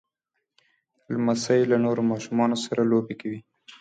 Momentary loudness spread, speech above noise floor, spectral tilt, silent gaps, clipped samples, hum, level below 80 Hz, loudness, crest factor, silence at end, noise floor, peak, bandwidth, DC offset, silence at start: 12 LU; 57 dB; -6 dB/octave; none; under 0.1%; none; -70 dBFS; -24 LUFS; 16 dB; 0.1 s; -81 dBFS; -8 dBFS; 9.2 kHz; under 0.1%; 1.1 s